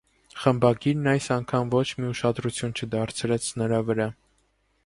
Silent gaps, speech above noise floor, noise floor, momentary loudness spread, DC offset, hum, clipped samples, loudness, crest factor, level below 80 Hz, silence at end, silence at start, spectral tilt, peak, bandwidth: none; 44 dB; -68 dBFS; 7 LU; under 0.1%; none; under 0.1%; -25 LUFS; 20 dB; -56 dBFS; 0.75 s; 0.35 s; -5.5 dB/octave; -6 dBFS; 11.5 kHz